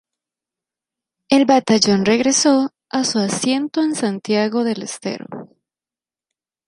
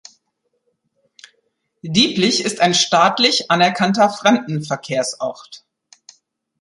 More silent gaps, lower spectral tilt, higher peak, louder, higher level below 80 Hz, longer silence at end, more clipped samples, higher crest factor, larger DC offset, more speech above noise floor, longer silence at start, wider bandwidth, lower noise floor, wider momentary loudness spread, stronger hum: neither; about the same, -3.5 dB/octave vs -3.5 dB/octave; about the same, 0 dBFS vs -2 dBFS; about the same, -17 LUFS vs -16 LUFS; about the same, -62 dBFS vs -62 dBFS; first, 1.2 s vs 1.05 s; neither; about the same, 18 dB vs 18 dB; neither; first, over 73 dB vs 54 dB; second, 1.3 s vs 1.85 s; about the same, 11.5 kHz vs 11.5 kHz; first, under -90 dBFS vs -71 dBFS; about the same, 13 LU vs 11 LU; neither